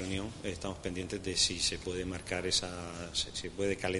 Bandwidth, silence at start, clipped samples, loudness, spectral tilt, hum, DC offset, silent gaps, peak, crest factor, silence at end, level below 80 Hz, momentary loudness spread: 11.5 kHz; 0 s; under 0.1%; -34 LUFS; -3 dB/octave; none; under 0.1%; none; -14 dBFS; 22 dB; 0 s; -52 dBFS; 10 LU